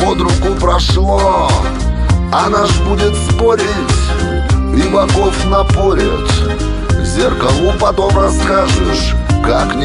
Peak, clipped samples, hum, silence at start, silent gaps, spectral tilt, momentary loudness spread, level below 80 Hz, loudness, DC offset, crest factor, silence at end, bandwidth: 0 dBFS; under 0.1%; none; 0 s; none; -5.5 dB/octave; 3 LU; -18 dBFS; -13 LUFS; under 0.1%; 12 dB; 0 s; 11 kHz